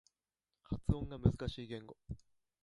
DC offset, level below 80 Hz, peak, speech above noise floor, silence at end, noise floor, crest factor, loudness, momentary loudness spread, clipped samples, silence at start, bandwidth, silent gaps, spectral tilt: under 0.1%; -48 dBFS; -16 dBFS; over 52 dB; 0.45 s; under -90 dBFS; 24 dB; -39 LUFS; 17 LU; under 0.1%; 0.7 s; 11.5 kHz; none; -8.5 dB/octave